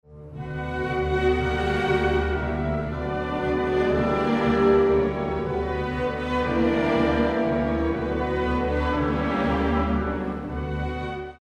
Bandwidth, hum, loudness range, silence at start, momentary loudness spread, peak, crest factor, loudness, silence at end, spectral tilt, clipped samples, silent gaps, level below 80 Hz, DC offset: 8.8 kHz; none; 2 LU; 0.1 s; 8 LU; -8 dBFS; 16 dB; -24 LUFS; 0.05 s; -7.5 dB/octave; under 0.1%; none; -34 dBFS; under 0.1%